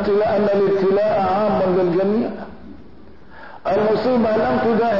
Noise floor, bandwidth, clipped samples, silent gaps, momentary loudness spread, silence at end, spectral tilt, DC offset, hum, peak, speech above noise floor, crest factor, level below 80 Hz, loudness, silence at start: -44 dBFS; 6 kHz; under 0.1%; none; 7 LU; 0 s; -8.5 dB/octave; 1%; none; -10 dBFS; 27 dB; 10 dB; -48 dBFS; -18 LUFS; 0 s